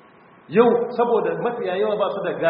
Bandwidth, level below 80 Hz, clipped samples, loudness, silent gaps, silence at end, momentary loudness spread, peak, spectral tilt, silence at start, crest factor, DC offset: 5.2 kHz; -68 dBFS; under 0.1%; -21 LUFS; none; 0 s; 7 LU; -4 dBFS; -4.5 dB/octave; 0.5 s; 18 dB; under 0.1%